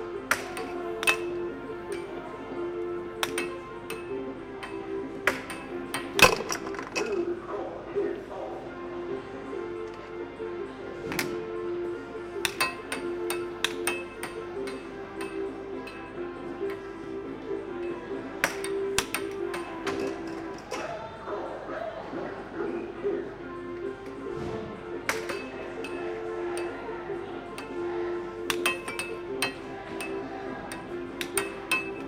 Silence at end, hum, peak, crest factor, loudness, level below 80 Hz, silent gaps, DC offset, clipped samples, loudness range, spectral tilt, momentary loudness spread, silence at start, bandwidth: 0 s; none; -2 dBFS; 32 dB; -32 LUFS; -56 dBFS; none; under 0.1%; under 0.1%; 8 LU; -3 dB/octave; 9 LU; 0 s; 16 kHz